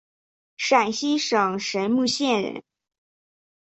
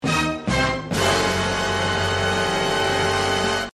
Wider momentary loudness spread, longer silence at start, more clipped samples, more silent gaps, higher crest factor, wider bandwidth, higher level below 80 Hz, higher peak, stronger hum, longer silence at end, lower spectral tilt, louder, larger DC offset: first, 8 LU vs 2 LU; first, 0.6 s vs 0 s; neither; neither; about the same, 20 dB vs 16 dB; second, 8.2 kHz vs 13 kHz; second, -70 dBFS vs -40 dBFS; about the same, -4 dBFS vs -6 dBFS; neither; first, 1.05 s vs 0.05 s; about the same, -3.5 dB/octave vs -3.5 dB/octave; about the same, -23 LUFS vs -21 LUFS; neither